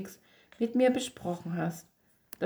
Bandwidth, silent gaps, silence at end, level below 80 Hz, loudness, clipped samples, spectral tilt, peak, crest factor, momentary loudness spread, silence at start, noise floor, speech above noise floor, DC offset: over 20 kHz; none; 0 s; -70 dBFS; -31 LUFS; under 0.1%; -5.5 dB/octave; -14 dBFS; 18 dB; 20 LU; 0 s; -52 dBFS; 21 dB; under 0.1%